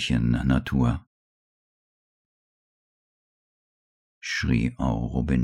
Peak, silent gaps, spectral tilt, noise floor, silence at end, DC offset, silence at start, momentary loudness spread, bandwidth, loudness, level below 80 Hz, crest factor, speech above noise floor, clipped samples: -10 dBFS; 1.07-4.21 s; -6.5 dB/octave; under -90 dBFS; 0 s; under 0.1%; 0 s; 7 LU; 10.5 kHz; -25 LUFS; -38 dBFS; 18 dB; over 66 dB; under 0.1%